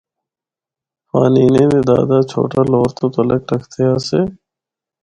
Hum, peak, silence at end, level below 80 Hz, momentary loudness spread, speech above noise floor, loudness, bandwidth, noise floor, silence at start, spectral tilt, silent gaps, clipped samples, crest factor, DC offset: none; 0 dBFS; 0.7 s; -48 dBFS; 7 LU; 75 dB; -15 LUFS; 10.5 kHz; -88 dBFS; 1.15 s; -8 dB/octave; none; under 0.1%; 16 dB; under 0.1%